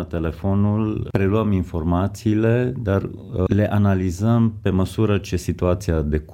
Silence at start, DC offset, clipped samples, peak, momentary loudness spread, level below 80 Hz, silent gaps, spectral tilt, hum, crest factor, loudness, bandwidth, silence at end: 0 s; under 0.1%; under 0.1%; -4 dBFS; 5 LU; -38 dBFS; none; -8 dB/octave; none; 16 dB; -21 LUFS; 15 kHz; 0 s